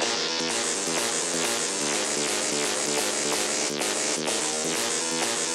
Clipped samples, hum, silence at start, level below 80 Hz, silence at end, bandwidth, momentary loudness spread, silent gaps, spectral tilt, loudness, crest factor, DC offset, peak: under 0.1%; none; 0 s; -68 dBFS; 0 s; 16 kHz; 1 LU; none; -0.5 dB/octave; -24 LUFS; 14 dB; under 0.1%; -12 dBFS